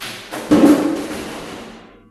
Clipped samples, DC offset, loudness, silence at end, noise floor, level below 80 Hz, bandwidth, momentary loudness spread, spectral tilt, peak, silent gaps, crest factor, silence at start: under 0.1%; under 0.1%; -16 LUFS; 0.3 s; -38 dBFS; -48 dBFS; 14 kHz; 21 LU; -5.5 dB/octave; 0 dBFS; none; 18 dB; 0 s